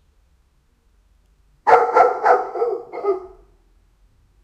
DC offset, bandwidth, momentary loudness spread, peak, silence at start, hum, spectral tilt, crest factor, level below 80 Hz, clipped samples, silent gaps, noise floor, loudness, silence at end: under 0.1%; 8.8 kHz; 10 LU; 0 dBFS; 1.65 s; none; -4.5 dB/octave; 20 dB; -58 dBFS; under 0.1%; none; -60 dBFS; -18 LUFS; 1.15 s